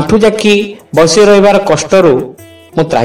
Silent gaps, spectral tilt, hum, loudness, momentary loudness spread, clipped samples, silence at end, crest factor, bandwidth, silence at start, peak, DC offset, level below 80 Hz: none; -4.5 dB/octave; none; -8 LUFS; 10 LU; 0.3%; 0 s; 8 dB; 15 kHz; 0 s; 0 dBFS; under 0.1%; -38 dBFS